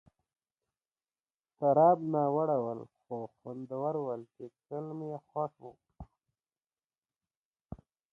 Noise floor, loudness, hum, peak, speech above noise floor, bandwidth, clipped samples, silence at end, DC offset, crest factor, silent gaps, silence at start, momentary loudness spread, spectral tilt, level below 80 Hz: under -90 dBFS; -32 LUFS; none; -12 dBFS; over 58 dB; 3.1 kHz; under 0.1%; 0.35 s; under 0.1%; 22 dB; 6.84-6.88 s, 6.98-7.02 s, 7.36-7.54 s; 1.6 s; 25 LU; -11.5 dB/octave; -66 dBFS